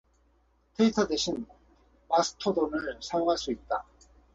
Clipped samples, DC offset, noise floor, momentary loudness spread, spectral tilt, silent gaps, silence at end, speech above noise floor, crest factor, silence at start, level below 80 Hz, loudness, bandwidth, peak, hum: under 0.1%; under 0.1%; -67 dBFS; 9 LU; -4 dB/octave; none; 0.55 s; 39 dB; 18 dB; 0.8 s; -58 dBFS; -29 LUFS; 8 kHz; -12 dBFS; none